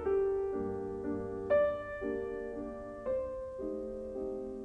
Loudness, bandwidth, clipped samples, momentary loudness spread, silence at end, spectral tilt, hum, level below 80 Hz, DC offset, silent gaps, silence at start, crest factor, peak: -36 LUFS; 4.5 kHz; under 0.1%; 11 LU; 0 s; -8.5 dB/octave; none; -56 dBFS; under 0.1%; none; 0 s; 16 dB; -18 dBFS